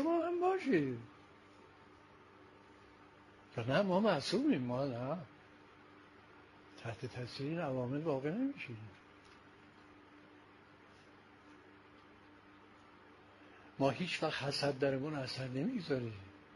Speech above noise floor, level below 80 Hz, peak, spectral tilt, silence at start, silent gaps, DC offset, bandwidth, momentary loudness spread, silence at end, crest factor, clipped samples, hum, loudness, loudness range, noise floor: 25 dB; -74 dBFS; -18 dBFS; -6 dB/octave; 0 s; none; under 0.1%; 11.5 kHz; 26 LU; 0 s; 22 dB; under 0.1%; none; -37 LUFS; 23 LU; -61 dBFS